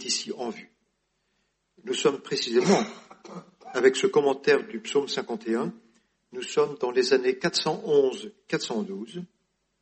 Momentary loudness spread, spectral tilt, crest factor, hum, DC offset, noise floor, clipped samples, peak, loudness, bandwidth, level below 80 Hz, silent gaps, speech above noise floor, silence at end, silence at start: 19 LU; -4 dB/octave; 20 dB; none; under 0.1%; -75 dBFS; under 0.1%; -6 dBFS; -26 LUFS; 8.8 kHz; -74 dBFS; none; 49 dB; 0.55 s; 0 s